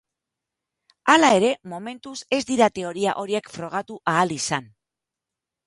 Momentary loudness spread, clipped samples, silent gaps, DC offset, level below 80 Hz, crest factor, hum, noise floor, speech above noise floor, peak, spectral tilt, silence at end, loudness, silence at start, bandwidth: 15 LU; under 0.1%; none; under 0.1%; -64 dBFS; 24 dB; none; -87 dBFS; 65 dB; 0 dBFS; -3.5 dB/octave; 1 s; -22 LUFS; 1.05 s; 11.5 kHz